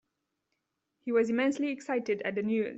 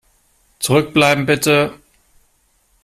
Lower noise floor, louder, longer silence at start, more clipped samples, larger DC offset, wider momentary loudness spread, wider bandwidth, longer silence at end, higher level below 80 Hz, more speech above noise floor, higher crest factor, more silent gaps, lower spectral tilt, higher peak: first, -82 dBFS vs -60 dBFS; second, -30 LUFS vs -15 LUFS; first, 1.05 s vs 0.6 s; neither; neither; about the same, 6 LU vs 8 LU; second, 8.2 kHz vs 15.5 kHz; second, 0 s vs 1.1 s; second, -76 dBFS vs -52 dBFS; first, 53 dB vs 45 dB; about the same, 16 dB vs 16 dB; neither; first, -6 dB/octave vs -4.5 dB/octave; second, -16 dBFS vs -2 dBFS